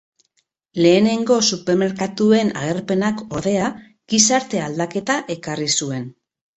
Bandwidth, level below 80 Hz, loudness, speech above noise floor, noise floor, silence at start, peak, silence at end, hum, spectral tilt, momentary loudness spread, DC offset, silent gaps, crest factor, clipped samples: 8.2 kHz; -58 dBFS; -18 LUFS; 50 dB; -68 dBFS; 0.75 s; -2 dBFS; 0.45 s; none; -3.5 dB/octave; 10 LU; under 0.1%; none; 18 dB; under 0.1%